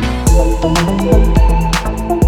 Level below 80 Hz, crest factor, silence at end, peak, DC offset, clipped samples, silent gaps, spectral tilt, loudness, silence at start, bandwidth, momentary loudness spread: -14 dBFS; 10 dB; 0 s; 0 dBFS; under 0.1%; under 0.1%; none; -6 dB/octave; -13 LUFS; 0 s; 16 kHz; 5 LU